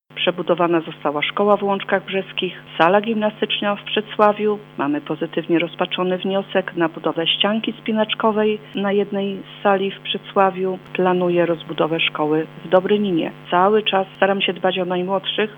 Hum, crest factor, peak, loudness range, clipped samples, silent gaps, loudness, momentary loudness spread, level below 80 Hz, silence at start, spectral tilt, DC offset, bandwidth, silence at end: none; 18 dB; 0 dBFS; 2 LU; under 0.1%; none; -20 LUFS; 7 LU; -68 dBFS; 0.1 s; -7.5 dB/octave; under 0.1%; 19 kHz; 0 s